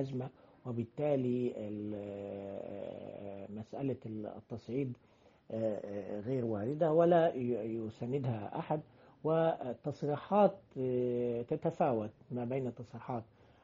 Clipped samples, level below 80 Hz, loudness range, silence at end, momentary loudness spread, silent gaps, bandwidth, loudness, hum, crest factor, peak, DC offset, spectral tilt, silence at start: under 0.1%; -72 dBFS; 9 LU; 0.4 s; 15 LU; none; 7.6 kHz; -36 LUFS; none; 20 dB; -14 dBFS; under 0.1%; -8 dB/octave; 0 s